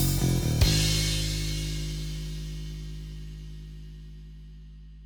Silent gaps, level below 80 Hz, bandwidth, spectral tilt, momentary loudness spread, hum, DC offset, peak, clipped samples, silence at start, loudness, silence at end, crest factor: none; -34 dBFS; over 20 kHz; -4 dB/octave; 24 LU; 50 Hz at -60 dBFS; under 0.1%; -8 dBFS; under 0.1%; 0 s; -28 LUFS; 0 s; 20 dB